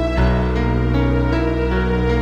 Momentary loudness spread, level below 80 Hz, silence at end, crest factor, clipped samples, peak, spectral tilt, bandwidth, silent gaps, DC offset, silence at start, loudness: 1 LU; -22 dBFS; 0 s; 12 dB; under 0.1%; -6 dBFS; -8.5 dB/octave; 7 kHz; none; under 0.1%; 0 s; -18 LUFS